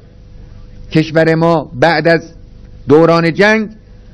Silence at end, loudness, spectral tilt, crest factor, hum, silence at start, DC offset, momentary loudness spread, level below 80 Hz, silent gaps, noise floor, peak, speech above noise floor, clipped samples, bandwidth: 0.4 s; -11 LUFS; -7 dB/octave; 12 dB; 50 Hz at -40 dBFS; 0.35 s; under 0.1%; 7 LU; -38 dBFS; none; -35 dBFS; 0 dBFS; 25 dB; 1%; 11 kHz